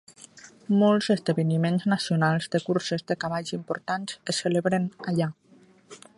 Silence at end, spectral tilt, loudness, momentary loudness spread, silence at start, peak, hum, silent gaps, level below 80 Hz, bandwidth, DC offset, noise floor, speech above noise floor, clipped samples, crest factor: 0.2 s; -6 dB/octave; -26 LUFS; 10 LU; 0.35 s; -10 dBFS; none; none; -68 dBFS; 11.5 kHz; under 0.1%; -56 dBFS; 31 dB; under 0.1%; 18 dB